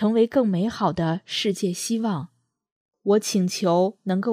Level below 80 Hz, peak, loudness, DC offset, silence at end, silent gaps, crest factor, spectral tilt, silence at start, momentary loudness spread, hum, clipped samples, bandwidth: -62 dBFS; -8 dBFS; -23 LUFS; under 0.1%; 0 s; 2.72-2.89 s; 16 dB; -5.5 dB/octave; 0 s; 7 LU; none; under 0.1%; 15.5 kHz